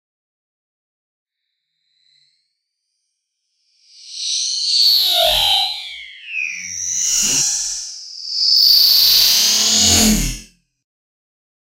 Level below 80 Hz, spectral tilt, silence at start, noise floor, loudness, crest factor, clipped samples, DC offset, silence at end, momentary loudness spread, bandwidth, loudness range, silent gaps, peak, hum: -38 dBFS; -0.5 dB/octave; 4.05 s; -75 dBFS; -12 LUFS; 18 dB; under 0.1%; under 0.1%; 1.3 s; 18 LU; 16 kHz; 7 LU; none; 0 dBFS; none